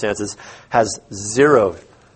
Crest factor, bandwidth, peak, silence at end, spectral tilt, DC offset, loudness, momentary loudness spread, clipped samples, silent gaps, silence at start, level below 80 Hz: 18 dB; 8.8 kHz; 0 dBFS; 0.35 s; -4.5 dB/octave; under 0.1%; -18 LUFS; 14 LU; under 0.1%; none; 0 s; -52 dBFS